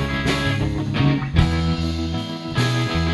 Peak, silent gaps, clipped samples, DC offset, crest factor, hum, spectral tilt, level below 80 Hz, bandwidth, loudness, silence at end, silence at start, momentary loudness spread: -2 dBFS; none; under 0.1%; under 0.1%; 18 dB; none; -6 dB/octave; -28 dBFS; 12 kHz; -21 LUFS; 0 s; 0 s; 6 LU